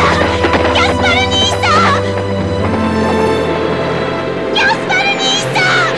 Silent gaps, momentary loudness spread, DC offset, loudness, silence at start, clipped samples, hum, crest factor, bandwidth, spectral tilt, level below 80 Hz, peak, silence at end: none; 6 LU; 0.7%; -12 LUFS; 0 s; under 0.1%; none; 12 dB; 11 kHz; -4 dB/octave; -32 dBFS; -2 dBFS; 0 s